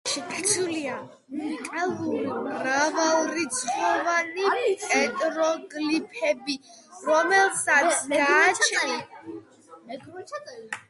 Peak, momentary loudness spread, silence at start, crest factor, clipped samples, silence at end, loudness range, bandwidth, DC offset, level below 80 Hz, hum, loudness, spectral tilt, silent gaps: -6 dBFS; 18 LU; 0.05 s; 20 dB; under 0.1%; 0.1 s; 4 LU; 11.5 kHz; under 0.1%; -74 dBFS; none; -24 LUFS; -1.5 dB/octave; none